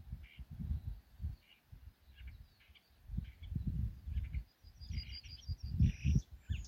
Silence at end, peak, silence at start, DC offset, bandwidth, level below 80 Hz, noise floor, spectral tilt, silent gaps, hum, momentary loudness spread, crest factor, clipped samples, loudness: 0 s; -20 dBFS; 0 s; under 0.1%; 14.5 kHz; -46 dBFS; -66 dBFS; -7 dB/octave; none; none; 24 LU; 20 dB; under 0.1%; -42 LUFS